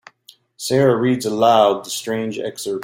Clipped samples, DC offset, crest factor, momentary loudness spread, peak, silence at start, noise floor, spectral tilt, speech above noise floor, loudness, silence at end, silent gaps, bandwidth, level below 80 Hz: under 0.1%; under 0.1%; 16 dB; 12 LU; -2 dBFS; 0.6 s; -51 dBFS; -5 dB/octave; 34 dB; -18 LUFS; 0 s; none; 16.5 kHz; -62 dBFS